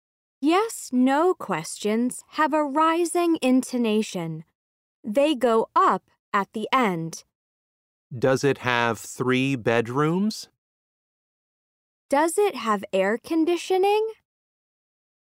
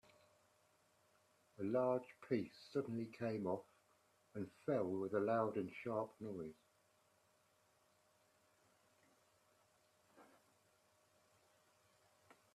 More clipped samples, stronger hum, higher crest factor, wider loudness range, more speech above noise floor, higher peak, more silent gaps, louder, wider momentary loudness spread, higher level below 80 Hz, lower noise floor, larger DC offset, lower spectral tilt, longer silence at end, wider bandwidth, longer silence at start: neither; neither; about the same, 20 dB vs 22 dB; second, 3 LU vs 9 LU; first, over 67 dB vs 35 dB; first, -6 dBFS vs -26 dBFS; first, 4.55-5.03 s, 6.19-6.32 s, 7.35-8.10 s, 10.58-12.09 s vs none; first, -23 LUFS vs -43 LUFS; about the same, 9 LU vs 11 LU; first, -70 dBFS vs -86 dBFS; first, under -90 dBFS vs -77 dBFS; neither; second, -5 dB/octave vs -8 dB/octave; second, 1.25 s vs 2.3 s; first, 16 kHz vs 13.5 kHz; second, 0.4 s vs 1.6 s